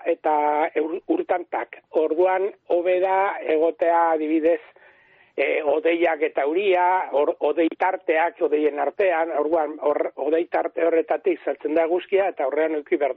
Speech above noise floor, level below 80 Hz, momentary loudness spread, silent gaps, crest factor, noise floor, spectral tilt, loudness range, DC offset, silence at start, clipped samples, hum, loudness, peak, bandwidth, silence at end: 34 dB; -72 dBFS; 5 LU; none; 12 dB; -55 dBFS; -1.5 dB/octave; 1 LU; under 0.1%; 0 s; under 0.1%; none; -22 LUFS; -10 dBFS; 4.2 kHz; 0 s